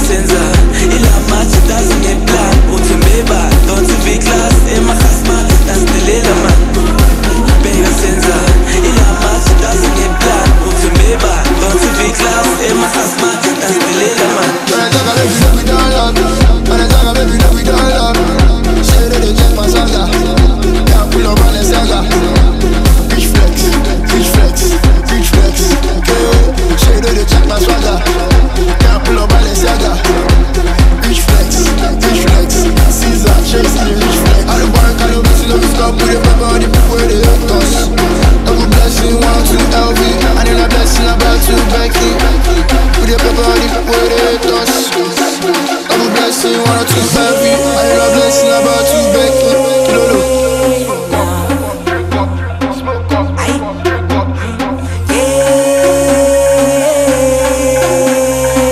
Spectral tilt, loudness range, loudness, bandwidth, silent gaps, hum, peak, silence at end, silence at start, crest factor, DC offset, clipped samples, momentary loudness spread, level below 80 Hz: -4.5 dB/octave; 1 LU; -10 LUFS; 15.5 kHz; none; none; 0 dBFS; 0 s; 0 s; 8 dB; under 0.1%; under 0.1%; 3 LU; -12 dBFS